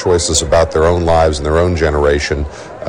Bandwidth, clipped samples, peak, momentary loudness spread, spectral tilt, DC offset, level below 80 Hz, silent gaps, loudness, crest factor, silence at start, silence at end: 12 kHz; under 0.1%; 0 dBFS; 6 LU; -4.5 dB/octave; under 0.1%; -24 dBFS; none; -13 LUFS; 12 dB; 0 s; 0 s